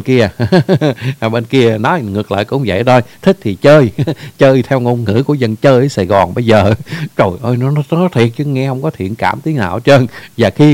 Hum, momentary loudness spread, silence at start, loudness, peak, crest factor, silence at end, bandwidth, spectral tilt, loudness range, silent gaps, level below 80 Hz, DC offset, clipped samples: none; 7 LU; 0 s; -12 LUFS; 0 dBFS; 12 dB; 0 s; 16.5 kHz; -7.5 dB/octave; 3 LU; none; -44 dBFS; under 0.1%; 0.6%